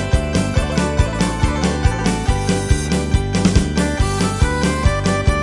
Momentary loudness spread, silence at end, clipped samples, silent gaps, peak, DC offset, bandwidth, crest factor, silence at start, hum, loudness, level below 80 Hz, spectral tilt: 2 LU; 0 s; under 0.1%; none; -2 dBFS; under 0.1%; 11.5 kHz; 16 dB; 0 s; none; -18 LUFS; -22 dBFS; -5.5 dB/octave